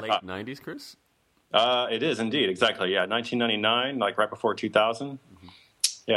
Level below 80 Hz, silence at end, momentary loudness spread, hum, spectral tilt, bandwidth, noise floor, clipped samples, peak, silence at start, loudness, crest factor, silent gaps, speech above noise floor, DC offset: -72 dBFS; 0 s; 15 LU; none; -3 dB/octave; 14.5 kHz; -52 dBFS; under 0.1%; -6 dBFS; 0 s; -25 LUFS; 22 dB; none; 26 dB; under 0.1%